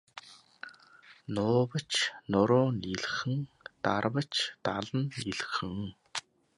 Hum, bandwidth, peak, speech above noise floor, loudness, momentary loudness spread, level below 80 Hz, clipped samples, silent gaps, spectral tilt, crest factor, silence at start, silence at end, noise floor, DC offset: none; 11.5 kHz; -12 dBFS; 27 dB; -31 LUFS; 21 LU; -62 dBFS; under 0.1%; none; -5 dB/octave; 20 dB; 0.15 s; 0.35 s; -58 dBFS; under 0.1%